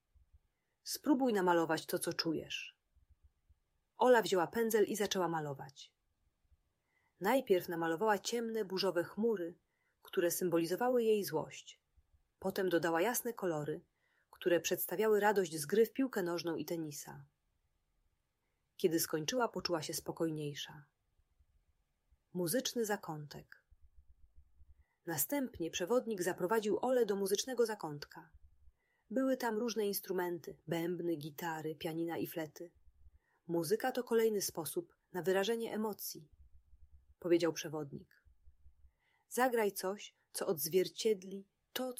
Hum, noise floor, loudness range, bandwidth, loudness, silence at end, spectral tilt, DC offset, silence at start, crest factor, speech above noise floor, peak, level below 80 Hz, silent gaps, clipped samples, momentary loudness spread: none; -84 dBFS; 6 LU; 16 kHz; -36 LUFS; 0.05 s; -4 dB/octave; under 0.1%; 0.85 s; 20 dB; 48 dB; -18 dBFS; -74 dBFS; none; under 0.1%; 14 LU